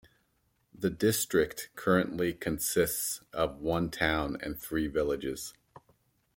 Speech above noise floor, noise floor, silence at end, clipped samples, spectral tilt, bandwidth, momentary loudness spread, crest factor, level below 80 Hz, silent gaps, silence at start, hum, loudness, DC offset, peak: 43 dB; -74 dBFS; 0.85 s; under 0.1%; -4 dB/octave; 17 kHz; 7 LU; 22 dB; -52 dBFS; none; 0.8 s; none; -31 LUFS; under 0.1%; -10 dBFS